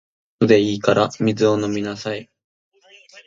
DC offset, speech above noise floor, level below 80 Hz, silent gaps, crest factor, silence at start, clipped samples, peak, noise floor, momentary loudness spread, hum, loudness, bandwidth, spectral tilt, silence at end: under 0.1%; 30 dB; -58 dBFS; 2.44-2.71 s; 20 dB; 0.4 s; under 0.1%; 0 dBFS; -48 dBFS; 12 LU; none; -19 LUFS; 7.6 kHz; -6 dB/octave; 0.05 s